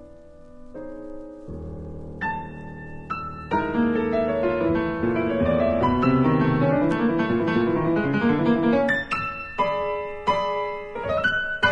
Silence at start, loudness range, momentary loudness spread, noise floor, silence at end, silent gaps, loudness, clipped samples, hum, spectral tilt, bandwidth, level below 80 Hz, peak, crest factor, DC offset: 0 s; 9 LU; 17 LU; -45 dBFS; 0 s; none; -23 LUFS; under 0.1%; none; -8 dB/octave; 8.6 kHz; -46 dBFS; -6 dBFS; 18 dB; under 0.1%